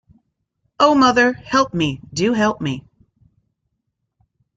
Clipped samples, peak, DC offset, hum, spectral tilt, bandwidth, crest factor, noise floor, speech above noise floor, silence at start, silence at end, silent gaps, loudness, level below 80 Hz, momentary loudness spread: under 0.1%; 0 dBFS; under 0.1%; none; -5 dB/octave; 9 kHz; 20 dB; -75 dBFS; 58 dB; 0.8 s; 1.75 s; none; -17 LUFS; -52 dBFS; 12 LU